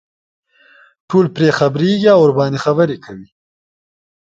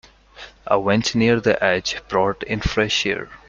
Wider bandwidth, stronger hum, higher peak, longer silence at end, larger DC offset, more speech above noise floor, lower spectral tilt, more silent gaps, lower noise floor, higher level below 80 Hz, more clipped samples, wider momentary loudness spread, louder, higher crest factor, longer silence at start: about the same, 7.8 kHz vs 7.6 kHz; neither; about the same, 0 dBFS vs -2 dBFS; first, 1 s vs 0.1 s; neither; first, 36 dB vs 23 dB; first, -7 dB/octave vs -4.5 dB/octave; neither; first, -49 dBFS vs -43 dBFS; second, -58 dBFS vs -40 dBFS; neither; about the same, 8 LU vs 6 LU; first, -13 LUFS vs -20 LUFS; about the same, 16 dB vs 18 dB; first, 1.1 s vs 0.35 s